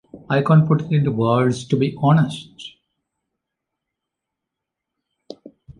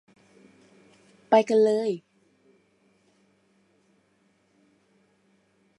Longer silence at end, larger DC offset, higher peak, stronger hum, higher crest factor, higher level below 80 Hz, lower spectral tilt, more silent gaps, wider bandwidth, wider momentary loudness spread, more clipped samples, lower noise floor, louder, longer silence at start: second, 0.3 s vs 3.8 s; neither; about the same, -4 dBFS vs -6 dBFS; neither; second, 18 dB vs 24 dB; first, -56 dBFS vs -84 dBFS; first, -8 dB/octave vs -5.5 dB/octave; neither; about the same, 10.5 kHz vs 11 kHz; first, 19 LU vs 12 LU; neither; first, -83 dBFS vs -67 dBFS; first, -18 LUFS vs -23 LUFS; second, 0.15 s vs 1.3 s